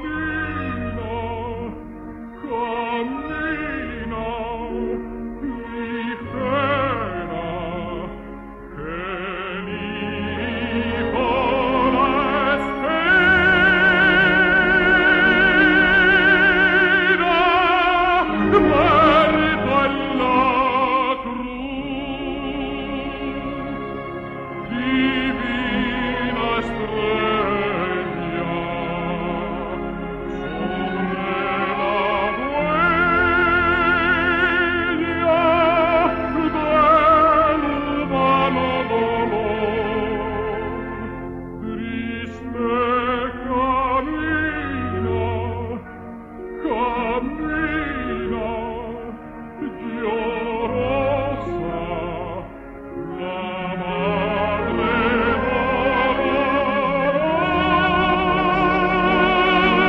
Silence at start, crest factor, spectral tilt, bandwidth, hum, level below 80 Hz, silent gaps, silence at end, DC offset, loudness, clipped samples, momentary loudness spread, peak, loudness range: 0 s; 16 dB; -7.5 dB/octave; 7.8 kHz; none; -38 dBFS; none; 0 s; under 0.1%; -19 LUFS; under 0.1%; 15 LU; -4 dBFS; 11 LU